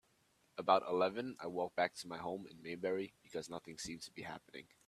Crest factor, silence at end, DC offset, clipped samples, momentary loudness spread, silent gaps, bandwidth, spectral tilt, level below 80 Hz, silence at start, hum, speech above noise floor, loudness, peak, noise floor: 26 dB; 0.25 s; under 0.1%; under 0.1%; 15 LU; none; 14 kHz; -4 dB/octave; -78 dBFS; 0.55 s; none; 35 dB; -40 LUFS; -16 dBFS; -75 dBFS